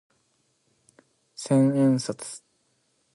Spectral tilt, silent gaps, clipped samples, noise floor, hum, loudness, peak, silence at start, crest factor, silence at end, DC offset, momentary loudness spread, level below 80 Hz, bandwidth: -6.5 dB/octave; none; under 0.1%; -70 dBFS; none; -23 LUFS; -12 dBFS; 1.4 s; 16 dB; 0.8 s; under 0.1%; 21 LU; -72 dBFS; 11.5 kHz